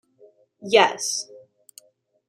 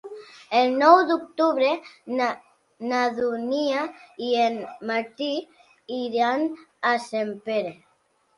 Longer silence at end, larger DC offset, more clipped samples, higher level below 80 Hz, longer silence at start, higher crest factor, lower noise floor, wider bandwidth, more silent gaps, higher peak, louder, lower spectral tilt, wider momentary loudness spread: first, 0.9 s vs 0.65 s; neither; neither; about the same, -74 dBFS vs -74 dBFS; first, 0.6 s vs 0.05 s; about the same, 24 dB vs 22 dB; second, -59 dBFS vs -66 dBFS; first, 14.5 kHz vs 11.5 kHz; neither; about the same, -2 dBFS vs -2 dBFS; first, -20 LUFS vs -24 LUFS; second, -1 dB/octave vs -4 dB/octave; first, 22 LU vs 15 LU